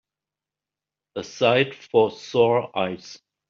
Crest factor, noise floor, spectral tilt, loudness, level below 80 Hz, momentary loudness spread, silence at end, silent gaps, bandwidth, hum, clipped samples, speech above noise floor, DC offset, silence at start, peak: 20 dB; -89 dBFS; -3.5 dB/octave; -22 LUFS; -68 dBFS; 17 LU; 0.35 s; none; 7.2 kHz; none; under 0.1%; 67 dB; under 0.1%; 1.15 s; -6 dBFS